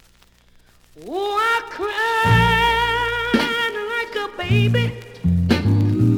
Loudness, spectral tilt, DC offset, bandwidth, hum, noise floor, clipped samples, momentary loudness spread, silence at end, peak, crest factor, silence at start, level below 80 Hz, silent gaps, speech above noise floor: -19 LUFS; -6 dB/octave; under 0.1%; 17.5 kHz; none; -53 dBFS; under 0.1%; 10 LU; 0 s; -2 dBFS; 16 dB; 0.95 s; -38 dBFS; none; 35 dB